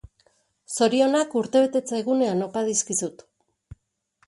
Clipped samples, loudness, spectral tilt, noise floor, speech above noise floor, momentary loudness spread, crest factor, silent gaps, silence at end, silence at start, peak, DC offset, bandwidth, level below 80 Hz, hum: under 0.1%; -23 LUFS; -3.5 dB/octave; -67 dBFS; 45 dB; 7 LU; 18 dB; none; 1.15 s; 0.7 s; -8 dBFS; under 0.1%; 11.5 kHz; -60 dBFS; none